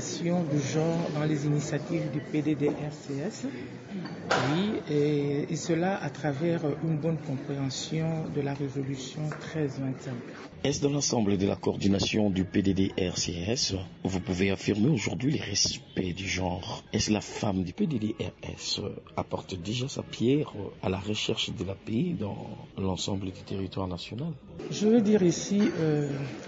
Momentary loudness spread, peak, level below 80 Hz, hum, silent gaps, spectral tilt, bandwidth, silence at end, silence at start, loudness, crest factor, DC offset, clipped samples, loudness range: 10 LU; -10 dBFS; -58 dBFS; none; none; -5 dB/octave; 8 kHz; 0 s; 0 s; -29 LUFS; 18 dB; under 0.1%; under 0.1%; 4 LU